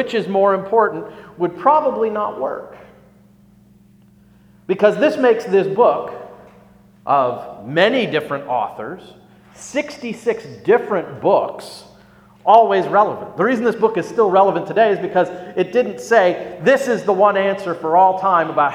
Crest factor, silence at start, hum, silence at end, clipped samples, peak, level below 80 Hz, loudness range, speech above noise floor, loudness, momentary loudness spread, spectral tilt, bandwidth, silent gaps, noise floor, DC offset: 18 dB; 0 s; 60 Hz at -50 dBFS; 0 s; under 0.1%; 0 dBFS; -62 dBFS; 6 LU; 33 dB; -17 LUFS; 12 LU; -5.5 dB/octave; 14.5 kHz; none; -49 dBFS; under 0.1%